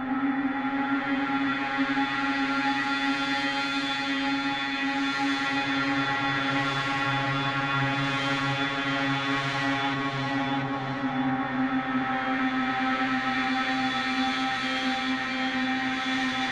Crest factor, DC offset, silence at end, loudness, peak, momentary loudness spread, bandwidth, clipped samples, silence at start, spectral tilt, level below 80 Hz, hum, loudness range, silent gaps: 14 dB; under 0.1%; 0 s; -26 LUFS; -14 dBFS; 2 LU; 10 kHz; under 0.1%; 0 s; -4.5 dB/octave; -60 dBFS; none; 1 LU; none